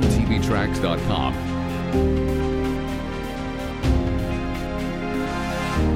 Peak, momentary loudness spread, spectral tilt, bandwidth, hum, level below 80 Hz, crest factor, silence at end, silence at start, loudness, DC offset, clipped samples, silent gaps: -6 dBFS; 7 LU; -6.5 dB/octave; 16 kHz; none; -28 dBFS; 16 dB; 0 s; 0 s; -24 LUFS; under 0.1%; under 0.1%; none